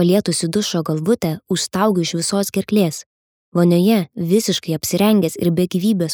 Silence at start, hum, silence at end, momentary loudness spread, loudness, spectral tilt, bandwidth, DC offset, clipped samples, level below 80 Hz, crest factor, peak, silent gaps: 0 s; none; 0 s; 6 LU; -18 LUFS; -5.5 dB/octave; over 20 kHz; under 0.1%; under 0.1%; -58 dBFS; 14 dB; -2 dBFS; 3.06-3.52 s